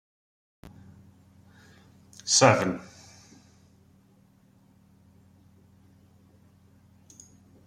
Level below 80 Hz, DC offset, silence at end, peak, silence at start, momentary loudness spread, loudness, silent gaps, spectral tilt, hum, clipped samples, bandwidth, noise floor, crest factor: -68 dBFS; under 0.1%; 4.85 s; -4 dBFS; 2.25 s; 32 LU; -23 LUFS; none; -3 dB/octave; none; under 0.1%; 14 kHz; -60 dBFS; 30 dB